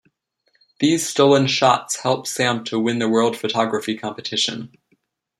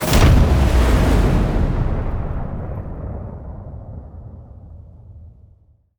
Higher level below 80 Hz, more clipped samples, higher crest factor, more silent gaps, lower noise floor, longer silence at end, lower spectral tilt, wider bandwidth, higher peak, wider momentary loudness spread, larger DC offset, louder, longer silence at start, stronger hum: second, -66 dBFS vs -20 dBFS; neither; about the same, 18 dB vs 16 dB; neither; first, -67 dBFS vs -52 dBFS; about the same, 0.7 s vs 0.7 s; second, -4 dB/octave vs -6.5 dB/octave; second, 15.5 kHz vs over 20 kHz; about the same, -2 dBFS vs -2 dBFS; second, 9 LU vs 24 LU; neither; about the same, -19 LUFS vs -18 LUFS; first, 0.8 s vs 0 s; neither